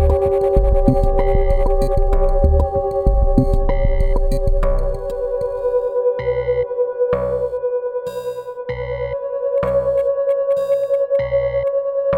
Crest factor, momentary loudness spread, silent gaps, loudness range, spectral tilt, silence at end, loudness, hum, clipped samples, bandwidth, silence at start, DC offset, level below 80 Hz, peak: 16 dB; 7 LU; none; 4 LU; -9 dB/octave; 0 s; -19 LUFS; none; under 0.1%; 8.8 kHz; 0 s; under 0.1%; -20 dBFS; -2 dBFS